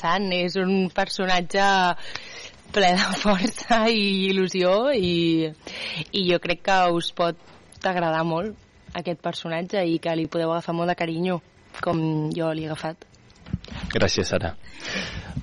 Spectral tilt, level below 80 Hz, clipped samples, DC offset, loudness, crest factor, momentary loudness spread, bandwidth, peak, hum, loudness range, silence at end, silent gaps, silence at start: -5 dB/octave; -48 dBFS; under 0.1%; under 0.1%; -24 LUFS; 14 dB; 13 LU; 11.5 kHz; -10 dBFS; none; 5 LU; 0 s; none; 0 s